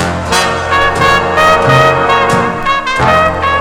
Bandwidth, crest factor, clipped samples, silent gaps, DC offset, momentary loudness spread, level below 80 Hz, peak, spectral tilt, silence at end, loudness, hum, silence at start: over 20 kHz; 10 dB; 1%; none; under 0.1%; 5 LU; -30 dBFS; 0 dBFS; -4 dB/octave; 0 s; -9 LUFS; none; 0 s